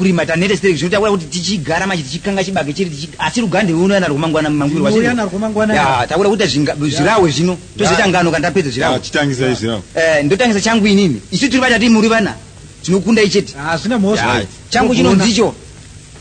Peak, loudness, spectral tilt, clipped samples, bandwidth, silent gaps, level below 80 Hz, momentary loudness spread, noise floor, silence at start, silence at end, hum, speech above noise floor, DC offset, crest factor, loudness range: 0 dBFS; -14 LUFS; -5 dB/octave; under 0.1%; 9.6 kHz; none; -40 dBFS; 7 LU; -36 dBFS; 0 s; 0 s; none; 22 dB; under 0.1%; 14 dB; 3 LU